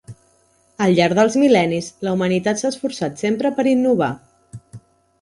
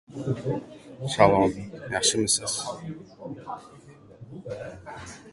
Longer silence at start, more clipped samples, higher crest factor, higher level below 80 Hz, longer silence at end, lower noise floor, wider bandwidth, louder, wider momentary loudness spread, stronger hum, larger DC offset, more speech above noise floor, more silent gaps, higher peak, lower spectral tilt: about the same, 0.1 s vs 0.1 s; neither; second, 16 dB vs 26 dB; about the same, -56 dBFS vs -54 dBFS; first, 0.45 s vs 0 s; first, -58 dBFS vs -48 dBFS; about the same, 11.5 kHz vs 12 kHz; first, -18 LUFS vs -24 LUFS; second, 9 LU vs 21 LU; neither; neither; first, 41 dB vs 21 dB; neither; about the same, -4 dBFS vs -2 dBFS; first, -5.5 dB/octave vs -3.5 dB/octave